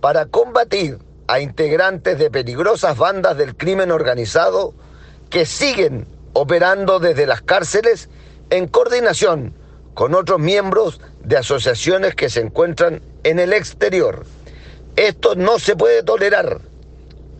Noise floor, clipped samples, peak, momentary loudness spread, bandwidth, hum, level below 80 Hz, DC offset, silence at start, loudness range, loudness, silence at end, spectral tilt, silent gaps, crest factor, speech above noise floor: -38 dBFS; under 0.1%; 0 dBFS; 7 LU; 9 kHz; none; -42 dBFS; under 0.1%; 0 s; 1 LU; -16 LUFS; 0 s; -4.5 dB/octave; none; 16 dB; 23 dB